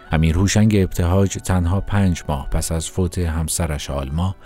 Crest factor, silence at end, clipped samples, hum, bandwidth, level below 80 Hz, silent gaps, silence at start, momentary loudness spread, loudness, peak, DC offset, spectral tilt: 14 dB; 0 s; under 0.1%; none; 16 kHz; -28 dBFS; none; 0 s; 8 LU; -20 LUFS; -4 dBFS; under 0.1%; -5.5 dB/octave